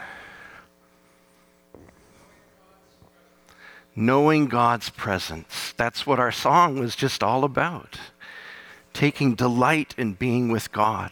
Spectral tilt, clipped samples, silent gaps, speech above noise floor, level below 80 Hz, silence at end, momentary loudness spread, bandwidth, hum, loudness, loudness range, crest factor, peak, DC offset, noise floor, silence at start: -5.5 dB/octave; under 0.1%; none; 37 dB; -56 dBFS; 0 s; 22 LU; 18.5 kHz; none; -22 LUFS; 3 LU; 18 dB; -6 dBFS; under 0.1%; -59 dBFS; 0 s